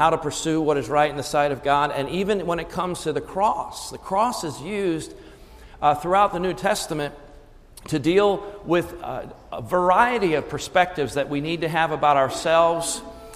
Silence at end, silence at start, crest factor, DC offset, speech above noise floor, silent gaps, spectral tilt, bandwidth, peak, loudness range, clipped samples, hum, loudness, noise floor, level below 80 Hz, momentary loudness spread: 0 s; 0 s; 18 dB; under 0.1%; 24 dB; none; -4.5 dB/octave; 15.5 kHz; -4 dBFS; 4 LU; under 0.1%; none; -22 LUFS; -47 dBFS; -48 dBFS; 11 LU